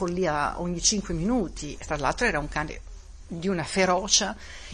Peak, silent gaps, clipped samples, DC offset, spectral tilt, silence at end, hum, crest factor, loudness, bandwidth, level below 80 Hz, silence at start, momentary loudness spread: -6 dBFS; none; under 0.1%; under 0.1%; -3 dB/octave; 0 s; none; 22 dB; -26 LUFS; 10.5 kHz; -42 dBFS; 0 s; 14 LU